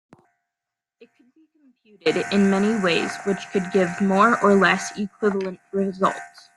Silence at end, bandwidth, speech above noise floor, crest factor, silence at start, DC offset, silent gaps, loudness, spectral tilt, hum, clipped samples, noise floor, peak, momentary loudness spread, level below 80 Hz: 0.3 s; 12 kHz; 64 dB; 20 dB; 2.05 s; under 0.1%; none; -21 LUFS; -5.5 dB/octave; none; under 0.1%; -86 dBFS; -2 dBFS; 10 LU; -64 dBFS